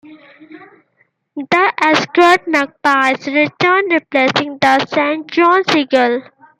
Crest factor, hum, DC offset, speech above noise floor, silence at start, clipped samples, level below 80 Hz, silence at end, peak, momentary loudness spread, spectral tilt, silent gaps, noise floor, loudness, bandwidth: 14 dB; none; under 0.1%; 47 dB; 0.1 s; under 0.1%; -64 dBFS; 0.4 s; 0 dBFS; 6 LU; -4 dB/octave; none; -61 dBFS; -13 LUFS; 13.5 kHz